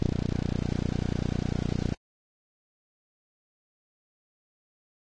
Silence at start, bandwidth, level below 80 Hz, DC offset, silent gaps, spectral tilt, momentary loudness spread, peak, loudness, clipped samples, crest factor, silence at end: 0 s; 9.2 kHz; -40 dBFS; under 0.1%; none; -7.5 dB/octave; 2 LU; -12 dBFS; -31 LUFS; under 0.1%; 22 dB; 3.2 s